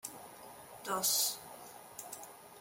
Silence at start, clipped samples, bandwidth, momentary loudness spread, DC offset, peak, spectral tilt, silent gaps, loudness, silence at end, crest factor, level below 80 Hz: 0.05 s; under 0.1%; 17 kHz; 21 LU; under 0.1%; -20 dBFS; 0 dB/octave; none; -33 LUFS; 0 s; 22 dB; -80 dBFS